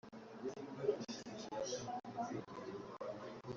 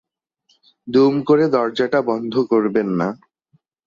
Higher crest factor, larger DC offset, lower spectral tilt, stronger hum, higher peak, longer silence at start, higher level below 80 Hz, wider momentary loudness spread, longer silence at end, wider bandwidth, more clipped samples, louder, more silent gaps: first, 22 dB vs 16 dB; neither; second, -4.5 dB/octave vs -7.5 dB/octave; neither; second, -24 dBFS vs -4 dBFS; second, 0.05 s vs 0.85 s; second, -78 dBFS vs -64 dBFS; about the same, 8 LU vs 7 LU; second, 0 s vs 0.7 s; about the same, 7.6 kHz vs 7.4 kHz; neither; second, -46 LUFS vs -18 LUFS; neither